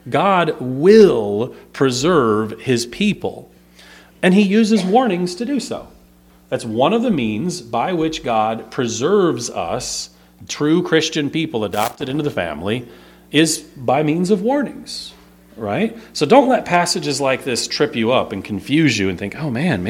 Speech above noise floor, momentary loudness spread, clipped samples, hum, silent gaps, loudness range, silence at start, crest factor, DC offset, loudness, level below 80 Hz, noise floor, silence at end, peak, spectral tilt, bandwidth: 32 dB; 11 LU; under 0.1%; 60 Hz at -45 dBFS; none; 4 LU; 0.05 s; 18 dB; under 0.1%; -17 LUFS; -52 dBFS; -49 dBFS; 0 s; 0 dBFS; -5 dB/octave; 19 kHz